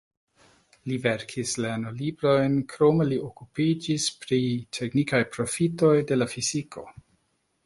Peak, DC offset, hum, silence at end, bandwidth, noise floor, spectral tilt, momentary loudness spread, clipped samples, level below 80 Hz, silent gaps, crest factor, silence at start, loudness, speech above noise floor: -8 dBFS; under 0.1%; none; 0.75 s; 11.5 kHz; -72 dBFS; -5 dB/octave; 10 LU; under 0.1%; -60 dBFS; none; 18 dB; 0.85 s; -25 LUFS; 47 dB